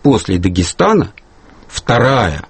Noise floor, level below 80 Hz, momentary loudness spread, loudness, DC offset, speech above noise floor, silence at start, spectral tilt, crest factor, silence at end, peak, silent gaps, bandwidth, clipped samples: -41 dBFS; -34 dBFS; 12 LU; -13 LUFS; under 0.1%; 28 dB; 0.05 s; -5.5 dB/octave; 14 dB; 0.1 s; 0 dBFS; none; 8.8 kHz; under 0.1%